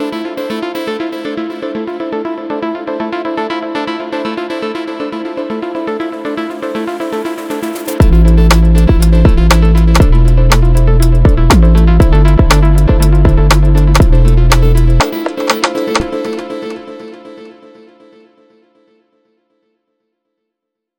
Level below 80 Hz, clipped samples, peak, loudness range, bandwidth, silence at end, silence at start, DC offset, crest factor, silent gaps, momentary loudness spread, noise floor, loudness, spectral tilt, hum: -12 dBFS; under 0.1%; 0 dBFS; 10 LU; 17 kHz; 3.45 s; 0 s; under 0.1%; 10 dB; none; 12 LU; -77 dBFS; -12 LUFS; -6.5 dB/octave; none